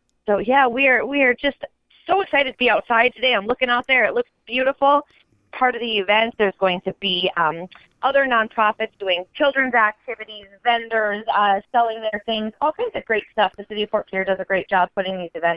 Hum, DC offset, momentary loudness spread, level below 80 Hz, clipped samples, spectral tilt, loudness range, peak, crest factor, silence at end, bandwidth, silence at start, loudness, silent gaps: none; under 0.1%; 9 LU; -56 dBFS; under 0.1%; -6.5 dB/octave; 4 LU; -2 dBFS; 18 dB; 0 s; 5.4 kHz; 0.25 s; -20 LUFS; none